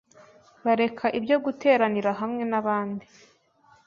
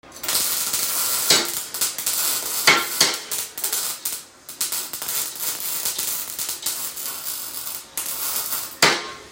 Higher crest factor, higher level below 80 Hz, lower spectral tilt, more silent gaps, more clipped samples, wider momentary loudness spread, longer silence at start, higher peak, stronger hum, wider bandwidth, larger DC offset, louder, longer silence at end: second, 18 dB vs 24 dB; second, -70 dBFS vs -62 dBFS; first, -6.5 dB/octave vs 0.5 dB/octave; neither; neither; second, 8 LU vs 11 LU; first, 0.65 s vs 0.05 s; second, -8 dBFS vs 0 dBFS; neither; second, 7.2 kHz vs 17 kHz; neither; second, -25 LUFS vs -21 LUFS; first, 0.85 s vs 0 s